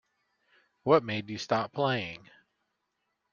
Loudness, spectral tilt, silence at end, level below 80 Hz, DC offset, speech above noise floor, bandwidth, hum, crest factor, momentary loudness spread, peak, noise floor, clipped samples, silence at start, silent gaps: -29 LUFS; -6 dB/octave; 1.15 s; -72 dBFS; under 0.1%; 52 dB; 7.2 kHz; none; 24 dB; 13 LU; -8 dBFS; -81 dBFS; under 0.1%; 0.85 s; none